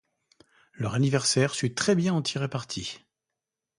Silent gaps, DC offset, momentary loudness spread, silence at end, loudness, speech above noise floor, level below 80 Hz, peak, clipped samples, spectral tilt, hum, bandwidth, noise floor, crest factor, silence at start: none; under 0.1%; 11 LU; 0.85 s; -26 LUFS; 61 dB; -62 dBFS; -10 dBFS; under 0.1%; -4.5 dB/octave; none; 11.5 kHz; -87 dBFS; 18 dB; 0.8 s